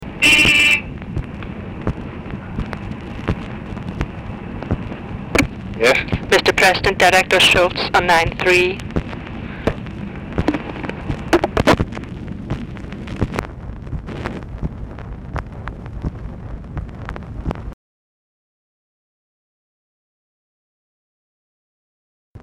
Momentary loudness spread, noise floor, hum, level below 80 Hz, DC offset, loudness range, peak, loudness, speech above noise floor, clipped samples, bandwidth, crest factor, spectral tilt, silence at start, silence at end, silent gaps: 19 LU; under -90 dBFS; none; -34 dBFS; under 0.1%; 18 LU; -6 dBFS; -17 LUFS; over 76 dB; under 0.1%; 17 kHz; 14 dB; -4 dB/octave; 0 s; 0 s; 17.73-22.35 s